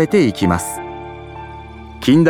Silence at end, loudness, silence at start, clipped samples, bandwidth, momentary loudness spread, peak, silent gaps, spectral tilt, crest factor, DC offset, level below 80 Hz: 0 s; -17 LUFS; 0 s; under 0.1%; 18.5 kHz; 19 LU; -2 dBFS; none; -6 dB/octave; 14 dB; under 0.1%; -40 dBFS